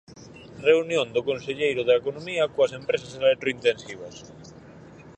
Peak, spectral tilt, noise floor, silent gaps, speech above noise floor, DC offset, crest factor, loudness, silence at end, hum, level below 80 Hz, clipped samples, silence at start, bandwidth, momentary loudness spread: -6 dBFS; -4.5 dB/octave; -46 dBFS; none; 22 dB; under 0.1%; 20 dB; -24 LUFS; 0.05 s; none; -62 dBFS; under 0.1%; 0.1 s; 9 kHz; 20 LU